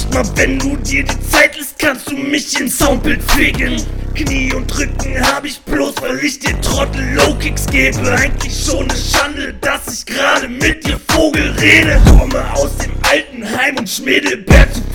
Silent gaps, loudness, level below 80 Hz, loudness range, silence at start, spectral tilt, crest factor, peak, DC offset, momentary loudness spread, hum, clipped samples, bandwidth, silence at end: none; -13 LUFS; -18 dBFS; 4 LU; 0 s; -4 dB/octave; 12 dB; 0 dBFS; under 0.1%; 9 LU; none; 0.7%; over 20 kHz; 0 s